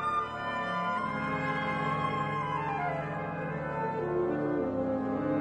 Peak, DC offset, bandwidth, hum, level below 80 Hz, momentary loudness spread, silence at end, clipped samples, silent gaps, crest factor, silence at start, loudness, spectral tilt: -18 dBFS; under 0.1%; 9.2 kHz; none; -56 dBFS; 4 LU; 0 s; under 0.1%; none; 12 dB; 0 s; -32 LUFS; -7.5 dB/octave